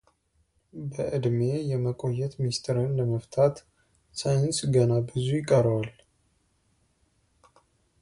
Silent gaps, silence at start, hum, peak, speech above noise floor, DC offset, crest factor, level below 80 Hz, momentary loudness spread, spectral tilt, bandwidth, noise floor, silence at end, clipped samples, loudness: none; 0.75 s; none; -8 dBFS; 44 dB; under 0.1%; 20 dB; -58 dBFS; 13 LU; -6.5 dB/octave; 11.5 kHz; -70 dBFS; 2.1 s; under 0.1%; -27 LUFS